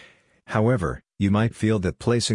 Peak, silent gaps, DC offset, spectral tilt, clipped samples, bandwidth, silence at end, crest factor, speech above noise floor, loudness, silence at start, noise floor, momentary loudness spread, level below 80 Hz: -6 dBFS; none; under 0.1%; -6 dB/octave; under 0.1%; 11 kHz; 0 s; 16 dB; 29 dB; -23 LUFS; 0.5 s; -51 dBFS; 5 LU; -46 dBFS